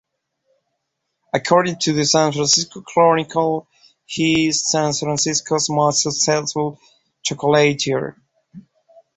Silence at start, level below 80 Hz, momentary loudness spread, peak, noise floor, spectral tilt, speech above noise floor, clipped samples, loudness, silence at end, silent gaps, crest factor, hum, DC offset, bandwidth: 1.35 s; -58 dBFS; 9 LU; -2 dBFS; -75 dBFS; -3.5 dB/octave; 57 dB; under 0.1%; -18 LUFS; 0.55 s; none; 18 dB; none; under 0.1%; 8.4 kHz